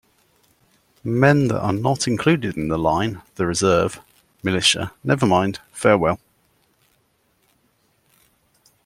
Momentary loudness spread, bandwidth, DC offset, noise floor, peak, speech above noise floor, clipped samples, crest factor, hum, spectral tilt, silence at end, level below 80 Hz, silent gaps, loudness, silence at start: 9 LU; 15.5 kHz; under 0.1%; -64 dBFS; -2 dBFS; 45 dB; under 0.1%; 20 dB; none; -5 dB/octave; 2.7 s; -50 dBFS; none; -20 LUFS; 1.05 s